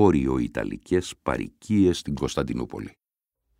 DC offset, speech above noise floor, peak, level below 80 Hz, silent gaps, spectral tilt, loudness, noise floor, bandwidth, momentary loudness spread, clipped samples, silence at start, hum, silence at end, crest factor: under 0.1%; 60 dB; -6 dBFS; -44 dBFS; none; -6.5 dB/octave; -26 LUFS; -84 dBFS; 15.5 kHz; 11 LU; under 0.1%; 0 s; none; 0.7 s; 20 dB